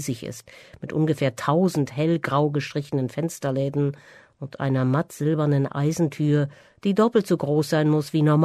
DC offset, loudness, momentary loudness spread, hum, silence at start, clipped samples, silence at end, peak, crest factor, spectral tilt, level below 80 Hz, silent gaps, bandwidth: under 0.1%; -23 LUFS; 10 LU; none; 0 s; under 0.1%; 0 s; -6 dBFS; 16 dB; -7 dB/octave; -62 dBFS; none; 13.5 kHz